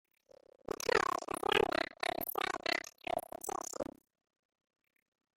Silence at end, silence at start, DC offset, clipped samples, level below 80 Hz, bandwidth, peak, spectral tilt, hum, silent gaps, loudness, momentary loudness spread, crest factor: 1.55 s; 0.9 s; under 0.1%; under 0.1%; -66 dBFS; 16.5 kHz; -12 dBFS; -2.5 dB/octave; none; none; -36 LUFS; 12 LU; 26 dB